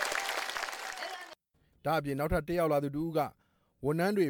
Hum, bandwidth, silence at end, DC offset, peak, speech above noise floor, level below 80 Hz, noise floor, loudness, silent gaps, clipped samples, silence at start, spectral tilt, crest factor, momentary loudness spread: none; 19 kHz; 0 s; under 0.1%; -16 dBFS; 40 dB; -52 dBFS; -71 dBFS; -33 LUFS; none; under 0.1%; 0 s; -5 dB/octave; 18 dB; 10 LU